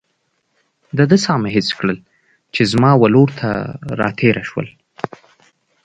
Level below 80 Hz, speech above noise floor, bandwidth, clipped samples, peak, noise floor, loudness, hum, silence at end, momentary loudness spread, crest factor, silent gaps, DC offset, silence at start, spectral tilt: -50 dBFS; 52 dB; 9.2 kHz; under 0.1%; 0 dBFS; -67 dBFS; -16 LUFS; none; 1.15 s; 17 LU; 16 dB; none; under 0.1%; 0.95 s; -6.5 dB/octave